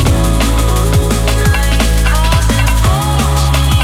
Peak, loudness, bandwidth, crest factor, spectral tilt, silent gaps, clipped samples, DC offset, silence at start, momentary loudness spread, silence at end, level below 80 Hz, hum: 0 dBFS; -12 LUFS; 16.5 kHz; 10 dB; -5 dB/octave; none; under 0.1%; under 0.1%; 0 s; 1 LU; 0 s; -12 dBFS; none